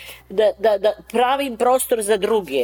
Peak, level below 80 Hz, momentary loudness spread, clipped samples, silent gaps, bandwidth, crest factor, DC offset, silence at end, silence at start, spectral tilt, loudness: -6 dBFS; -54 dBFS; 3 LU; under 0.1%; none; over 20 kHz; 12 dB; under 0.1%; 0 s; 0 s; -3 dB/octave; -19 LUFS